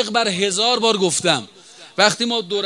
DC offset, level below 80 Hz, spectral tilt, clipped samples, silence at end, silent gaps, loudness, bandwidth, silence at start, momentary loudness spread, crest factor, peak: under 0.1%; -68 dBFS; -2.5 dB/octave; under 0.1%; 0 s; none; -17 LUFS; 12 kHz; 0 s; 5 LU; 20 dB; 0 dBFS